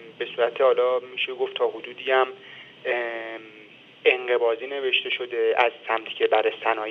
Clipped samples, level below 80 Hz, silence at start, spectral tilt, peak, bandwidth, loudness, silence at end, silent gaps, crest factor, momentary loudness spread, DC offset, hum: under 0.1%; -84 dBFS; 0 s; -4.5 dB/octave; -4 dBFS; 6.2 kHz; -24 LUFS; 0 s; none; 20 dB; 12 LU; under 0.1%; none